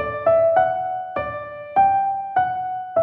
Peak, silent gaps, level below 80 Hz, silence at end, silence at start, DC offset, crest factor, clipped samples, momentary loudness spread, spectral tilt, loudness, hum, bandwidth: -6 dBFS; none; -52 dBFS; 0 s; 0 s; under 0.1%; 14 dB; under 0.1%; 11 LU; -8.5 dB/octave; -20 LUFS; none; 4 kHz